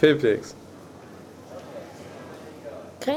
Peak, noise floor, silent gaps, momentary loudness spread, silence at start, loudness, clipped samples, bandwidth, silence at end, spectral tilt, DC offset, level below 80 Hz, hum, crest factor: -6 dBFS; -44 dBFS; none; 21 LU; 0 s; -27 LUFS; under 0.1%; 14.5 kHz; 0 s; -6 dB/octave; under 0.1%; -66 dBFS; none; 22 dB